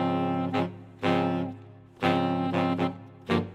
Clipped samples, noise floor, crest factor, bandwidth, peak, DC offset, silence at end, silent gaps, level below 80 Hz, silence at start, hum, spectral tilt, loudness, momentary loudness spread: under 0.1%; -47 dBFS; 18 dB; 10.5 kHz; -10 dBFS; under 0.1%; 0 s; none; -66 dBFS; 0 s; none; -7.5 dB/octave; -28 LUFS; 9 LU